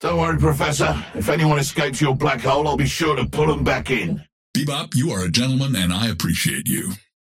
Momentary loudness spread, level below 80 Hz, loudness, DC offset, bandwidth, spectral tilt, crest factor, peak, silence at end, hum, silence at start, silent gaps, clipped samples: 5 LU; -38 dBFS; -20 LUFS; under 0.1%; 16.5 kHz; -5 dB/octave; 16 dB; -4 dBFS; 0.25 s; none; 0 s; 4.32-4.54 s; under 0.1%